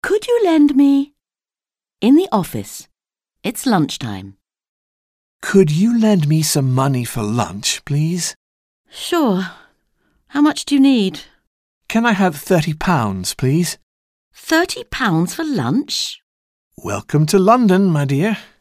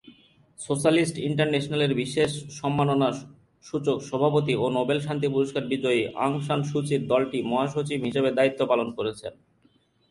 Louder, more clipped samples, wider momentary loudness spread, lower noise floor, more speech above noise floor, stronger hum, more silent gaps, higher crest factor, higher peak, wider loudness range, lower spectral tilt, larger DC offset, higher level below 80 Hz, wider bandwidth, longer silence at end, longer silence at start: first, -16 LUFS vs -25 LUFS; neither; first, 14 LU vs 8 LU; first, under -90 dBFS vs -64 dBFS; first, over 74 dB vs 39 dB; neither; first, 4.69-5.40 s, 8.36-8.84 s, 11.47-11.81 s, 13.83-14.31 s, 16.23-16.71 s vs none; about the same, 16 dB vs 18 dB; first, -2 dBFS vs -8 dBFS; first, 4 LU vs 1 LU; about the same, -5.5 dB/octave vs -6 dB/octave; neither; first, -48 dBFS vs -62 dBFS; first, 16 kHz vs 11.5 kHz; second, 0.2 s vs 0.8 s; about the same, 0.05 s vs 0.05 s